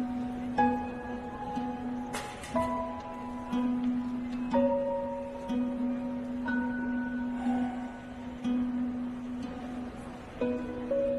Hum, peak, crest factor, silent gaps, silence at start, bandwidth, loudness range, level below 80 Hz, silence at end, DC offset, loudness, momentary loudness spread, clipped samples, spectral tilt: none; -16 dBFS; 18 dB; none; 0 s; 12 kHz; 3 LU; -54 dBFS; 0 s; under 0.1%; -33 LUFS; 10 LU; under 0.1%; -6.5 dB/octave